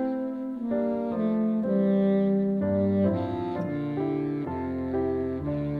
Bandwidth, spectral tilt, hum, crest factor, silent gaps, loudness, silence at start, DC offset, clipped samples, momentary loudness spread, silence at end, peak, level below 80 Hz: 4.7 kHz; -11 dB/octave; none; 14 dB; none; -27 LUFS; 0 s; under 0.1%; under 0.1%; 7 LU; 0 s; -12 dBFS; -54 dBFS